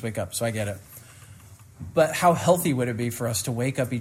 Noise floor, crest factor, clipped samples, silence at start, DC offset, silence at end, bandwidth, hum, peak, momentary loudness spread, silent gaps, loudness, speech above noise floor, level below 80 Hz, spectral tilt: -48 dBFS; 20 dB; under 0.1%; 0 s; under 0.1%; 0 s; 16 kHz; none; -6 dBFS; 19 LU; none; -24 LUFS; 23 dB; -58 dBFS; -5 dB/octave